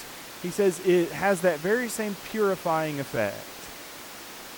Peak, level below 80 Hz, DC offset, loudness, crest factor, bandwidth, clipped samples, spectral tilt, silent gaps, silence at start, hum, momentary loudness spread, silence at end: -12 dBFS; -62 dBFS; under 0.1%; -26 LUFS; 16 dB; 19 kHz; under 0.1%; -4.5 dB/octave; none; 0 s; none; 16 LU; 0 s